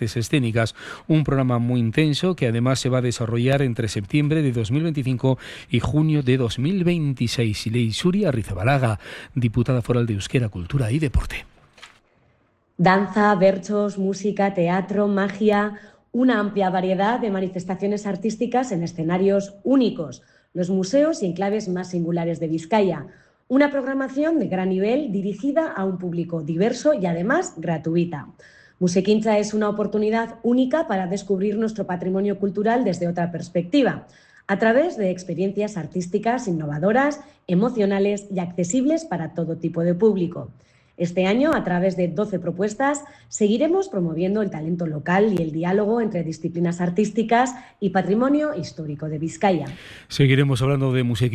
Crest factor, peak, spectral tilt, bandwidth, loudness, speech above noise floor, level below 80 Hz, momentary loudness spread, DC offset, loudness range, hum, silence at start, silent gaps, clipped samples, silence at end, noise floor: 16 dB; -6 dBFS; -6.5 dB/octave; 12.5 kHz; -22 LUFS; 42 dB; -44 dBFS; 7 LU; under 0.1%; 2 LU; none; 0 s; none; under 0.1%; 0 s; -63 dBFS